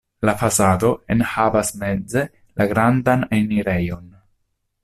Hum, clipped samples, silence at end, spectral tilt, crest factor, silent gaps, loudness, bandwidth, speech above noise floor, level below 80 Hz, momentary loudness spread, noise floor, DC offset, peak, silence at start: none; under 0.1%; 0.75 s; -5.5 dB/octave; 16 dB; none; -19 LUFS; 15 kHz; 51 dB; -46 dBFS; 8 LU; -70 dBFS; under 0.1%; -4 dBFS; 0.2 s